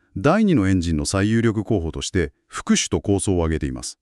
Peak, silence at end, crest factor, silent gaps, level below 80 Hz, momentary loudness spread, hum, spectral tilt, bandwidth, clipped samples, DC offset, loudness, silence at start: -4 dBFS; 0.1 s; 16 dB; none; -36 dBFS; 8 LU; none; -5.5 dB/octave; 12 kHz; under 0.1%; under 0.1%; -21 LUFS; 0.15 s